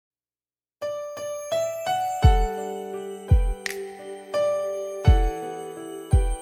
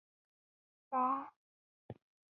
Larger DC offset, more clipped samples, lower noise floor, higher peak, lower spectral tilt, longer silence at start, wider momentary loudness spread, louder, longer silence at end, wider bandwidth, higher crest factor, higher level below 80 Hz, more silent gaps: neither; neither; about the same, under -90 dBFS vs under -90 dBFS; first, -4 dBFS vs -24 dBFS; about the same, -6 dB/octave vs -6.5 dB/octave; about the same, 0.8 s vs 0.9 s; second, 14 LU vs 21 LU; first, -26 LUFS vs -37 LUFS; second, 0 s vs 0.4 s; first, 16 kHz vs 4 kHz; about the same, 20 dB vs 20 dB; first, -26 dBFS vs -82 dBFS; second, none vs 1.36-1.89 s